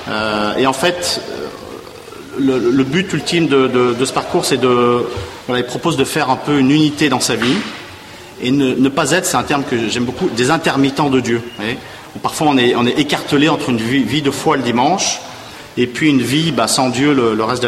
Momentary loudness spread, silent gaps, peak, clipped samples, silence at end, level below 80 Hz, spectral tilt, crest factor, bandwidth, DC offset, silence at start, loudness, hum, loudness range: 13 LU; none; -2 dBFS; under 0.1%; 0 s; -48 dBFS; -4.5 dB/octave; 14 dB; 15 kHz; under 0.1%; 0 s; -15 LUFS; none; 2 LU